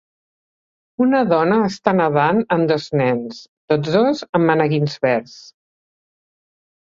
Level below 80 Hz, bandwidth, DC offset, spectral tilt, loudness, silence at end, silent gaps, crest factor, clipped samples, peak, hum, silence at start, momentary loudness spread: -60 dBFS; 7.6 kHz; under 0.1%; -7 dB/octave; -18 LUFS; 1.4 s; 3.48-3.68 s, 4.29-4.33 s; 18 dB; under 0.1%; -2 dBFS; none; 1 s; 7 LU